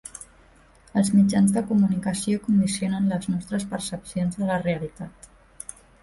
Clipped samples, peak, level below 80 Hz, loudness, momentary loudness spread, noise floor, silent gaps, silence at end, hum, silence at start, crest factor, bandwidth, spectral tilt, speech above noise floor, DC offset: under 0.1%; -10 dBFS; -54 dBFS; -24 LUFS; 20 LU; -54 dBFS; none; 0.95 s; none; 0.05 s; 14 dB; 11.5 kHz; -6 dB/octave; 31 dB; under 0.1%